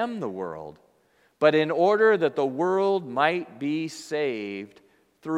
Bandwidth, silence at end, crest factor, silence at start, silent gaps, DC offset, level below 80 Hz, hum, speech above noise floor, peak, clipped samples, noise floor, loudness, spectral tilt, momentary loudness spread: 11.5 kHz; 0 s; 20 dB; 0 s; none; under 0.1%; -74 dBFS; none; 40 dB; -4 dBFS; under 0.1%; -64 dBFS; -24 LUFS; -5.5 dB/octave; 17 LU